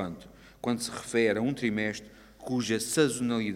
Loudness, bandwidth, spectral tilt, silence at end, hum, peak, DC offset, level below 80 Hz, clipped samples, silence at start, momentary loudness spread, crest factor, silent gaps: -29 LUFS; 16 kHz; -4.5 dB/octave; 0 s; none; -12 dBFS; under 0.1%; -60 dBFS; under 0.1%; 0 s; 13 LU; 18 dB; none